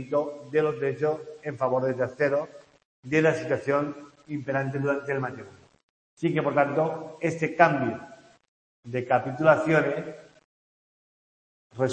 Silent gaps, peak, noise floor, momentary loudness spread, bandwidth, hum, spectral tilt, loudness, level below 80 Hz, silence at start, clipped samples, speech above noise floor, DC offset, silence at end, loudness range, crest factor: 2.85-3.03 s, 5.83-6.17 s, 8.48-8.83 s, 10.44-11.70 s; -2 dBFS; under -90 dBFS; 14 LU; 8.8 kHz; none; -7 dB/octave; -26 LUFS; -70 dBFS; 0 s; under 0.1%; over 64 dB; under 0.1%; 0 s; 3 LU; 24 dB